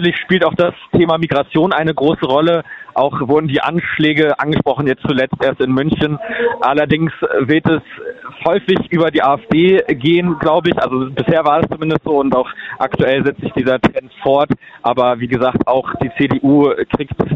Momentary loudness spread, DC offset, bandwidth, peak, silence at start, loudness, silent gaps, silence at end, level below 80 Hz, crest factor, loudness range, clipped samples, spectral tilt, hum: 6 LU; under 0.1%; 6.8 kHz; 0 dBFS; 0 s; -15 LUFS; none; 0 s; -44 dBFS; 14 dB; 2 LU; under 0.1%; -8.5 dB/octave; none